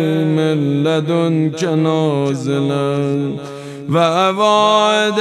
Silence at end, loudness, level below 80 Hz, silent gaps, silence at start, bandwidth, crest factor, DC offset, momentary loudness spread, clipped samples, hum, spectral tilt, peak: 0 s; -15 LUFS; -66 dBFS; none; 0 s; 13 kHz; 14 dB; under 0.1%; 7 LU; under 0.1%; none; -6 dB/octave; -2 dBFS